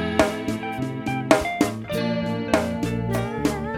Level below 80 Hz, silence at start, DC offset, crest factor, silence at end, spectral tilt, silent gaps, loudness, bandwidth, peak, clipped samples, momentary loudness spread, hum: -44 dBFS; 0 s; under 0.1%; 24 dB; 0 s; -5.5 dB/octave; none; -24 LUFS; 17.5 kHz; 0 dBFS; under 0.1%; 7 LU; none